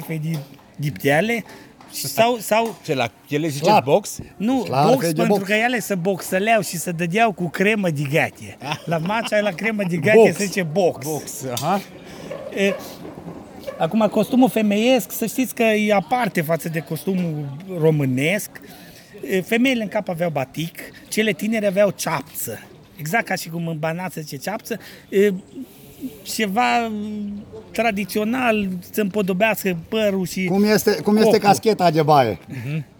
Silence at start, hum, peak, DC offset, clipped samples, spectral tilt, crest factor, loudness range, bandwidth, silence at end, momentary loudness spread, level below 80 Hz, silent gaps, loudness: 0 s; none; 0 dBFS; under 0.1%; under 0.1%; -5 dB/octave; 20 dB; 5 LU; over 20 kHz; 0.15 s; 15 LU; -58 dBFS; none; -20 LUFS